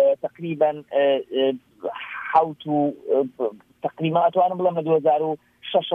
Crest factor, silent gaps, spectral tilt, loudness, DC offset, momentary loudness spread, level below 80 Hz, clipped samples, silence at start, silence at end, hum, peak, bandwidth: 16 dB; none; -8.5 dB/octave; -23 LUFS; under 0.1%; 12 LU; -72 dBFS; under 0.1%; 0 s; 0 s; none; -6 dBFS; 4.3 kHz